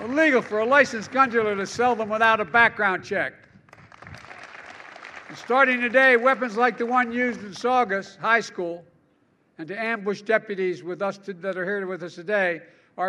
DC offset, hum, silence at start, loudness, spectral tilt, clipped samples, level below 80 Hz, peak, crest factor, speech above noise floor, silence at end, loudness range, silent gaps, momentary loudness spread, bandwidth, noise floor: under 0.1%; none; 0 s; -22 LUFS; -4.5 dB/octave; under 0.1%; -68 dBFS; -4 dBFS; 20 dB; 41 dB; 0 s; 7 LU; none; 22 LU; 11 kHz; -64 dBFS